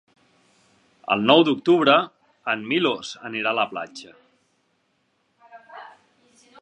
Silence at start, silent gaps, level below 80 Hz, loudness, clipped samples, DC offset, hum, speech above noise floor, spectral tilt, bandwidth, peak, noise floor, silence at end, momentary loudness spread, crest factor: 1.1 s; none; -74 dBFS; -21 LUFS; under 0.1%; under 0.1%; none; 48 dB; -5 dB/octave; 8.8 kHz; -2 dBFS; -69 dBFS; 0.75 s; 25 LU; 22 dB